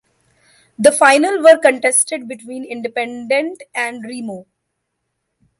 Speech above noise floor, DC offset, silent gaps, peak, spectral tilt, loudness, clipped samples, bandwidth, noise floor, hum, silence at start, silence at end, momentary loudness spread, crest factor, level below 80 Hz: 59 dB; under 0.1%; none; 0 dBFS; -2 dB/octave; -14 LUFS; under 0.1%; 11.5 kHz; -74 dBFS; none; 0.8 s; 1.15 s; 18 LU; 16 dB; -66 dBFS